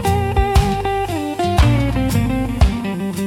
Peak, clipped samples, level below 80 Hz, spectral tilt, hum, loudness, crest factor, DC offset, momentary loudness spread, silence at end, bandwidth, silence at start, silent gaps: -2 dBFS; under 0.1%; -22 dBFS; -6.5 dB/octave; none; -18 LUFS; 14 dB; under 0.1%; 6 LU; 0 s; 16.5 kHz; 0 s; none